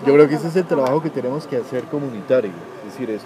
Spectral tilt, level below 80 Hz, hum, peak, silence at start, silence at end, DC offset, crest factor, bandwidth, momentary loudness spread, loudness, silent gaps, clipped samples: -7.5 dB/octave; -72 dBFS; none; 0 dBFS; 0 s; 0 s; under 0.1%; 18 dB; 13.5 kHz; 15 LU; -20 LUFS; none; under 0.1%